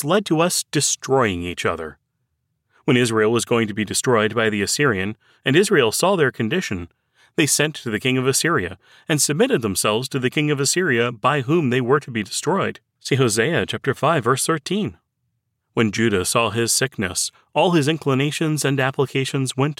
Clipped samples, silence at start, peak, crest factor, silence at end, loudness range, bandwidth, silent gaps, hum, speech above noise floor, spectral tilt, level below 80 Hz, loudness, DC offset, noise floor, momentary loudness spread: under 0.1%; 0 s; -6 dBFS; 16 dB; 0.05 s; 2 LU; 17 kHz; none; none; 53 dB; -4 dB/octave; -56 dBFS; -20 LUFS; under 0.1%; -73 dBFS; 7 LU